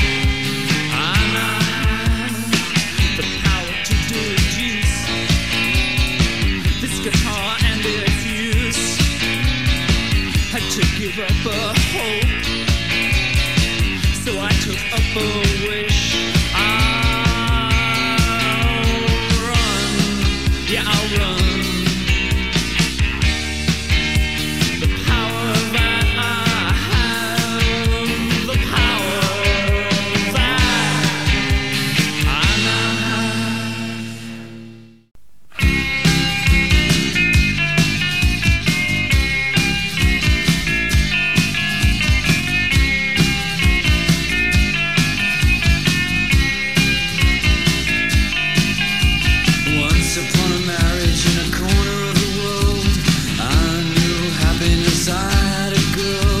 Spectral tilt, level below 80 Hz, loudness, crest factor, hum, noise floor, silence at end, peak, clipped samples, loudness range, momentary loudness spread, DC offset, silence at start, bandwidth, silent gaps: -4 dB/octave; -24 dBFS; -17 LUFS; 16 dB; none; -39 dBFS; 0 s; 0 dBFS; under 0.1%; 2 LU; 4 LU; 2%; 0 s; 16 kHz; none